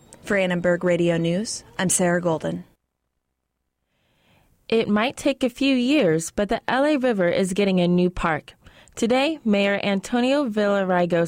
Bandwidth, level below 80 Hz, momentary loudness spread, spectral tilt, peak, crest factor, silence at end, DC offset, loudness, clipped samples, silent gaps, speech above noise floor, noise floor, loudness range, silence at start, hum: 16 kHz; -50 dBFS; 6 LU; -5 dB/octave; -8 dBFS; 14 dB; 0 s; under 0.1%; -22 LUFS; under 0.1%; none; 56 dB; -77 dBFS; 6 LU; 0.25 s; none